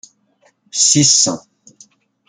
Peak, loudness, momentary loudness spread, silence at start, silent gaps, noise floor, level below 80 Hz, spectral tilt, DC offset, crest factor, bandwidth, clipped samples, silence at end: 0 dBFS; -12 LUFS; 16 LU; 0.75 s; none; -58 dBFS; -60 dBFS; -2 dB/octave; under 0.1%; 18 dB; 11 kHz; under 0.1%; 0.9 s